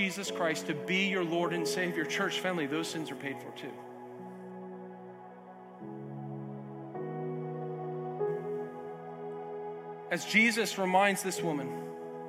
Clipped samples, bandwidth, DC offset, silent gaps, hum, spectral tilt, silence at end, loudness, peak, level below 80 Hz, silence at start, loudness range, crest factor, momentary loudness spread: under 0.1%; 16.5 kHz; under 0.1%; none; none; -4 dB/octave; 0 s; -33 LUFS; -12 dBFS; -88 dBFS; 0 s; 14 LU; 22 dB; 19 LU